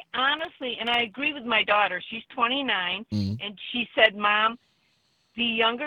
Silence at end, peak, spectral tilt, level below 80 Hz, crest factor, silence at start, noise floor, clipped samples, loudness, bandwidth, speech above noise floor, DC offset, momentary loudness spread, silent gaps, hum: 0 s; -4 dBFS; -5.5 dB/octave; -66 dBFS; 22 dB; 0.15 s; -68 dBFS; under 0.1%; -24 LUFS; 10 kHz; 42 dB; under 0.1%; 11 LU; none; none